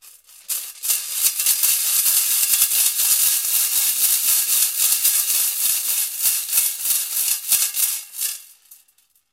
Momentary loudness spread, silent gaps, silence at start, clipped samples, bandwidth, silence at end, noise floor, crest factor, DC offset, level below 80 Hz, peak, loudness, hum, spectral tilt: 8 LU; none; 0.05 s; under 0.1%; 16.5 kHz; 0.6 s; -61 dBFS; 20 dB; under 0.1%; -66 dBFS; 0 dBFS; -16 LUFS; none; 4.5 dB/octave